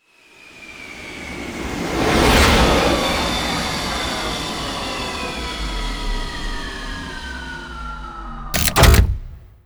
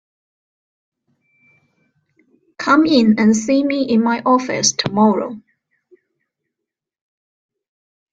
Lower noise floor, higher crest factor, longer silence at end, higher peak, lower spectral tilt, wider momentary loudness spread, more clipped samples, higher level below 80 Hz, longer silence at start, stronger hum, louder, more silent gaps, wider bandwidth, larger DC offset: second, -47 dBFS vs -83 dBFS; about the same, 20 dB vs 18 dB; second, 0.2 s vs 2.75 s; about the same, 0 dBFS vs -2 dBFS; about the same, -4 dB/octave vs -4 dB/octave; first, 18 LU vs 10 LU; neither; first, -26 dBFS vs -60 dBFS; second, 0.45 s vs 2.6 s; neither; second, -19 LUFS vs -15 LUFS; neither; first, over 20 kHz vs 9.2 kHz; neither